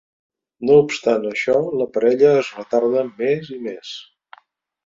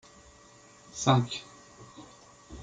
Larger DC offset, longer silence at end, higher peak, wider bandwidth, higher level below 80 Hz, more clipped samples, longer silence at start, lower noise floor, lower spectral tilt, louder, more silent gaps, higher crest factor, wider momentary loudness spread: neither; first, 0.85 s vs 0 s; first, -2 dBFS vs -8 dBFS; second, 7.6 kHz vs 9.4 kHz; about the same, -64 dBFS vs -60 dBFS; neither; second, 0.6 s vs 0.95 s; about the same, -57 dBFS vs -56 dBFS; about the same, -5.5 dB/octave vs -5 dB/octave; first, -18 LUFS vs -28 LUFS; neither; second, 18 dB vs 26 dB; second, 15 LU vs 25 LU